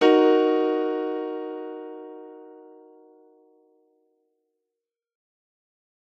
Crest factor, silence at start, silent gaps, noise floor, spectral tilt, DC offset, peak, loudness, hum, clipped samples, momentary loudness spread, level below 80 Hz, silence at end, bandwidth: 22 dB; 0 s; none; -87 dBFS; -4.5 dB/octave; under 0.1%; -6 dBFS; -23 LUFS; none; under 0.1%; 25 LU; under -90 dBFS; 3.5 s; 6.8 kHz